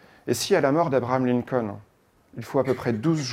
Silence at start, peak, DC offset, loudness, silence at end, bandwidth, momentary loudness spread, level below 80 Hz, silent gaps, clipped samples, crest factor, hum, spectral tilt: 0.25 s; -6 dBFS; under 0.1%; -24 LUFS; 0 s; 16.5 kHz; 15 LU; -62 dBFS; none; under 0.1%; 18 dB; none; -5.5 dB/octave